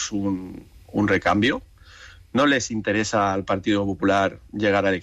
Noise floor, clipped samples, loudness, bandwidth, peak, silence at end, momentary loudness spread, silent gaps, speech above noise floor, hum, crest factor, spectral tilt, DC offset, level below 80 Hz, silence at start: -46 dBFS; under 0.1%; -22 LUFS; 9.4 kHz; -8 dBFS; 0 s; 10 LU; none; 24 dB; none; 14 dB; -4.5 dB/octave; under 0.1%; -50 dBFS; 0 s